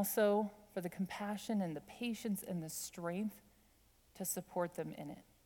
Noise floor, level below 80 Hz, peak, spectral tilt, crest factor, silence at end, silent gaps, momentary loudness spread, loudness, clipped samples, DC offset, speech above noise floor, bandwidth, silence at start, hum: -70 dBFS; -74 dBFS; -22 dBFS; -5 dB/octave; 18 dB; 0.25 s; none; 10 LU; -40 LUFS; under 0.1%; under 0.1%; 30 dB; 19.5 kHz; 0 s; none